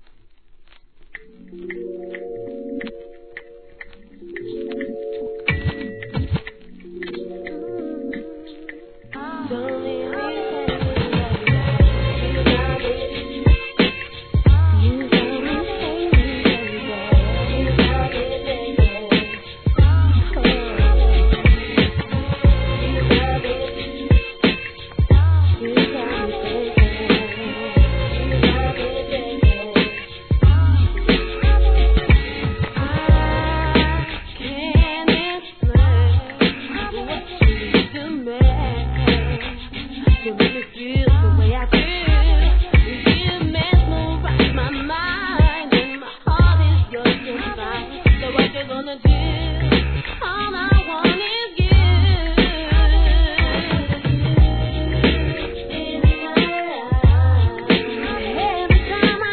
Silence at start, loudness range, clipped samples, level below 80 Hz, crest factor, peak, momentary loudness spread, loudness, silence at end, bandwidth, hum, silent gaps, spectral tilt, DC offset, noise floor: 1 s; 10 LU; under 0.1%; -22 dBFS; 18 dB; 0 dBFS; 13 LU; -19 LUFS; 0 s; 4.5 kHz; none; none; -10 dB/octave; 0.3%; -48 dBFS